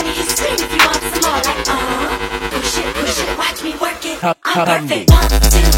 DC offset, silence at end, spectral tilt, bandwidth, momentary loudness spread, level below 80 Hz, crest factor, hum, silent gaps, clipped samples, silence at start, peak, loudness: under 0.1%; 0 s; -3.5 dB/octave; 17 kHz; 8 LU; -20 dBFS; 14 dB; none; none; under 0.1%; 0 s; 0 dBFS; -15 LUFS